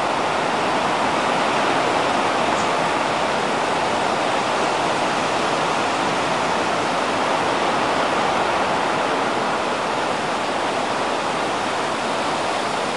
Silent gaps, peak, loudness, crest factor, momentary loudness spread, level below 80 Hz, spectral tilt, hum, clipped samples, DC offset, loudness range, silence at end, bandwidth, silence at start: none; -6 dBFS; -20 LUFS; 14 dB; 3 LU; -56 dBFS; -3.5 dB/octave; none; under 0.1%; 0.3%; 2 LU; 0 s; 11.5 kHz; 0 s